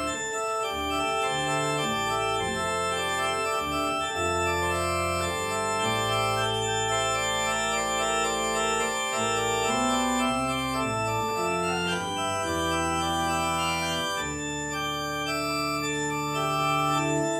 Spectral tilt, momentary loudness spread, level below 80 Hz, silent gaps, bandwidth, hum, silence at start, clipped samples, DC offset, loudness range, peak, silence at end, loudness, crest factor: -3 dB/octave; 3 LU; -50 dBFS; none; 16.5 kHz; none; 0 s; under 0.1%; under 0.1%; 2 LU; -14 dBFS; 0 s; -26 LUFS; 12 dB